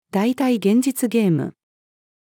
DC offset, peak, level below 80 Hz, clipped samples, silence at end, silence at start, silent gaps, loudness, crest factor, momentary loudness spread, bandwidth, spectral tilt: under 0.1%; -6 dBFS; -76 dBFS; under 0.1%; 0.85 s; 0.15 s; none; -19 LUFS; 14 dB; 5 LU; 18 kHz; -6 dB/octave